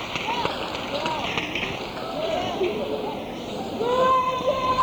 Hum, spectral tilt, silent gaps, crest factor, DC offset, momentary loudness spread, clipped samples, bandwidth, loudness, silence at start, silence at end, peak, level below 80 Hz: none; -4.5 dB/octave; none; 18 dB; under 0.1%; 10 LU; under 0.1%; over 20 kHz; -25 LUFS; 0 s; 0 s; -8 dBFS; -50 dBFS